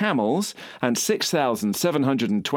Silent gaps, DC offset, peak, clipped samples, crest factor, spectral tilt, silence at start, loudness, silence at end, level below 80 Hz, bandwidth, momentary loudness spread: none; under 0.1%; -4 dBFS; under 0.1%; 18 dB; -4 dB/octave; 0 s; -23 LUFS; 0 s; -68 dBFS; 20 kHz; 5 LU